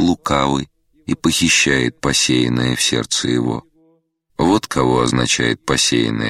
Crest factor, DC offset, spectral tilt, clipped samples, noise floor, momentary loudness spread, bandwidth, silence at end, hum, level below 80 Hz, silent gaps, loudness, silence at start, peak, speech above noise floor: 16 dB; under 0.1%; -3.5 dB/octave; under 0.1%; -60 dBFS; 10 LU; 16 kHz; 0 s; none; -40 dBFS; none; -16 LUFS; 0 s; 0 dBFS; 43 dB